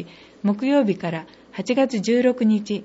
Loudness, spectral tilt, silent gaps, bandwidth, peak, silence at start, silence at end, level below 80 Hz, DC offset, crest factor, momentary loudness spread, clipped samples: -21 LUFS; -6.5 dB/octave; none; 8 kHz; -8 dBFS; 0 s; 0 s; -66 dBFS; under 0.1%; 14 dB; 14 LU; under 0.1%